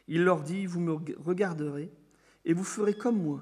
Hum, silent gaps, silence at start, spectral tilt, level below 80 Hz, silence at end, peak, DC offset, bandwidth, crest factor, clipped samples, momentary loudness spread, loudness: none; none; 0.1 s; -6.5 dB/octave; -76 dBFS; 0 s; -12 dBFS; under 0.1%; 12 kHz; 18 dB; under 0.1%; 10 LU; -30 LUFS